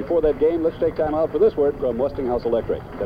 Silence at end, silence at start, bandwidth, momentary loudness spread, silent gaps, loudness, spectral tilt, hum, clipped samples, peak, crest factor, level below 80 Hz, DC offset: 0 s; 0 s; 5.2 kHz; 5 LU; none; -21 LUFS; -9 dB/octave; none; under 0.1%; -8 dBFS; 14 dB; -40 dBFS; under 0.1%